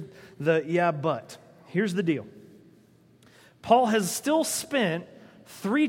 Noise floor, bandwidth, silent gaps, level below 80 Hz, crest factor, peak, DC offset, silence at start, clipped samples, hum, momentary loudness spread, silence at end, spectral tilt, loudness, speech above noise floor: -58 dBFS; 16.5 kHz; none; -72 dBFS; 22 dB; -6 dBFS; under 0.1%; 0 s; under 0.1%; none; 23 LU; 0 s; -4.5 dB/octave; -26 LUFS; 32 dB